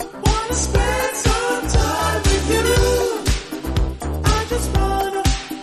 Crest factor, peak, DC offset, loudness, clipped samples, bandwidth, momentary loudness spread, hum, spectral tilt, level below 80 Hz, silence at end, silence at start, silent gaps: 16 dB; -2 dBFS; under 0.1%; -19 LUFS; under 0.1%; 13.5 kHz; 6 LU; none; -4.5 dB/octave; -24 dBFS; 0 s; 0 s; none